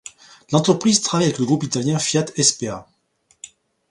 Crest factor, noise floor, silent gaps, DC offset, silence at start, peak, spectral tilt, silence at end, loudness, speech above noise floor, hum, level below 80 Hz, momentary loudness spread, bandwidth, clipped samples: 20 dB; -63 dBFS; none; under 0.1%; 0.5 s; 0 dBFS; -4 dB/octave; 0.45 s; -19 LUFS; 44 dB; none; -58 dBFS; 12 LU; 11.5 kHz; under 0.1%